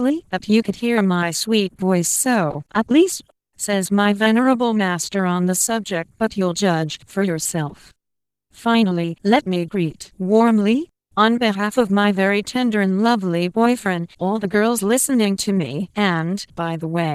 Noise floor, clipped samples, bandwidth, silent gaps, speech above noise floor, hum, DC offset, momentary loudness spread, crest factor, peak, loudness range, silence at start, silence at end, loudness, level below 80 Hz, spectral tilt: -83 dBFS; under 0.1%; 15.5 kHz; none; 65 dB; none; under 0.1%; 8 LU; 16 dB; -2 dBFS; 3 LU; 0 s; 0 s; -19 LUFS; -58 dBFS; -4.5 dB/octave